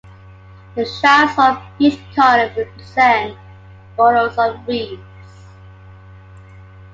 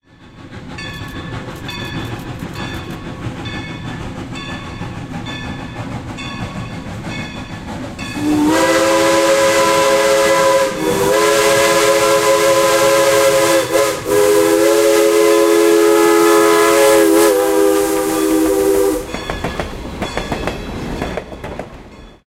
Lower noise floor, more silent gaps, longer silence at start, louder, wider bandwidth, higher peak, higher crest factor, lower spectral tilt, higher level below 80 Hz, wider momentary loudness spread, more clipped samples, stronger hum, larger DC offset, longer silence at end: about the same, -40 dBFS vs -39 dBFS; neither; first, 0.75 s vs 0.25 s; about the same, -15 LUFS vs -13 LUFS; second, 7.8 kHz vs 16 kHz; about the same, 0 dBFS vs 0 dBFS; about the same, 16 dB vs 14 dB; first, -5 dB/octave vs -3.5 dB/octave; second, -48 dBFS vs -38 dBFS; about the same, 16 LU vs 16 LU; neither; neither; neither; first, 1.7 s vs 0.15 s